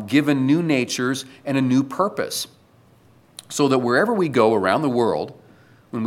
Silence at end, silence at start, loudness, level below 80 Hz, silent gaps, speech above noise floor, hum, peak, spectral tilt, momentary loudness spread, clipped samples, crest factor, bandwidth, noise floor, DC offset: 0 s; 0 s; -20 LUFS; -68 dBFS; none; 34 dB; none; -2 dBFS; -5.5 dB/octave; 10 LU; under 0.1%; 18 dB; 16 kHz; -54 dBFS; under 0.1%